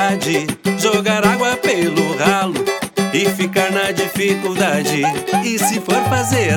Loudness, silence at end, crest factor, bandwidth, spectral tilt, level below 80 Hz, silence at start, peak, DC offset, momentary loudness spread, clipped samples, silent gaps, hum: -16 LUFS; 0 s; 16 dB; 19 kHz; -4 dB/octave; -54 dBFS; 0 s; 0 dBFS; under 0.1%; 4 LU; under 0.1%; none; none